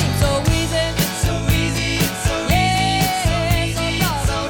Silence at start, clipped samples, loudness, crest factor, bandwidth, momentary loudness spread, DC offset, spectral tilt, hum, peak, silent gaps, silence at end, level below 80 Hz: 0 s; under 0.1%; -18 LUFS; 14 dB; 19 kHz; 3 LU; under 0.1%; -4.5 dB/octave; none; -6 dBFS; none; 0 s; -26 dBFS